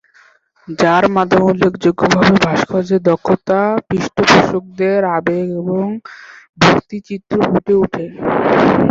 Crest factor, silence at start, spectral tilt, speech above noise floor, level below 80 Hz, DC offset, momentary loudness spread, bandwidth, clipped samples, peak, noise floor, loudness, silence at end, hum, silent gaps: 14 dB; 0.7 s; -6 dB/octave; 37 dB; -46 dBFS; under 0.1%; 9 LU; 7.8 kHz; under 0.1%; 0 dBFS; -50 dBFS; -14 LUFS; 0 s; none; 6.49-6.53 s